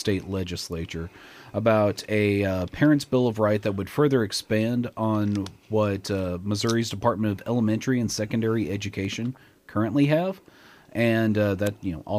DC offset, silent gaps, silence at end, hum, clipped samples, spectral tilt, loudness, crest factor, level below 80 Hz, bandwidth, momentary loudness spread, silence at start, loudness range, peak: under 0.1%; none; 0 s; none; under 0.1%; -6 dB/octave; -25 LUFS; 16 dB; -54 dBFS; 15.5 kHz; 10 LU; 0 s; 3 LU; -8 dBFS